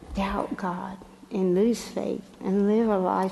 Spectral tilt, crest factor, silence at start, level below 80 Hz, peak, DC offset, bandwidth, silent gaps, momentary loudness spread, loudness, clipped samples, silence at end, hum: -7 dB/octave; 16 dB; 0 s; -48 dBFS; -10 dBFS; under 0.1%; 12 kHz; none; 12 LU; -26 LUFS; under 0.1%; 0 s; none